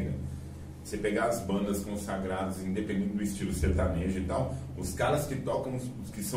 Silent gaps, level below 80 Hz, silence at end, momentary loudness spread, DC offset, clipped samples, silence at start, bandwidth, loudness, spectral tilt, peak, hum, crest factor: none; -42 dBFS; 0 s; 9 LU; under 0.1%; under 0.1%; 0 s; 16 kHz; -32 LUFS; -6 dB/octave; -14 dBFS; none; 16 dB